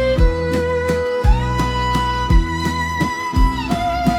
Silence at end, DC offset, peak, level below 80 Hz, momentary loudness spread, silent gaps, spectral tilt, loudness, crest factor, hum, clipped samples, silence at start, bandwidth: 0 s; under 0.1%; -2 dBFS; -20 dBFS; 3 LU; none; -6 dB/octave; -18 LUFS; 14 dB; none; under 0.1%; 0 s; 14.5 kHz